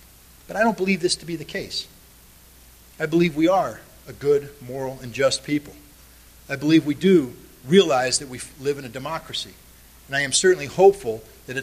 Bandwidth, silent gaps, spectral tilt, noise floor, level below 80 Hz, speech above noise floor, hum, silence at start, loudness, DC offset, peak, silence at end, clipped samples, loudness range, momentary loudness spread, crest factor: 15 kHz; none; -4 dB/octave; -50 dBFS; -52 dBFS; 28 dB; none; 0.5 s; -22 LUFS; under 0.1%; -2 dBFS; 0 s; under 0.1%; 4 LU; 16 LU; 20 dB